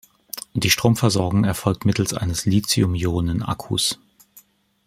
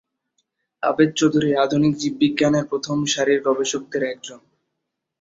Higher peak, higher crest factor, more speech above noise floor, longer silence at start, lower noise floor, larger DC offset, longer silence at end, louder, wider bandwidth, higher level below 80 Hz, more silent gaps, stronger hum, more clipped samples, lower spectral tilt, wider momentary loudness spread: about the same, -2 dBFS vs -2 dBFS; about the same, 20 dB vs 20 dB; second, 33 dB vs 60 dB; second, 0.35 s vs 0.8 s; second, -53 dBFS vs -79 dBFS; neither; second, 0.5 s vs 0.85 s; about the same, -20 LUFS vs -20 LUFS; first, 16.5 kHz vs 8 kHz; first, -44 dBFS vs -60 dBFS; neither; neither; neither; about the same, -4.5 dB/octave vs -4.5 dB/octave; about the same, 8 LU vs 8 LU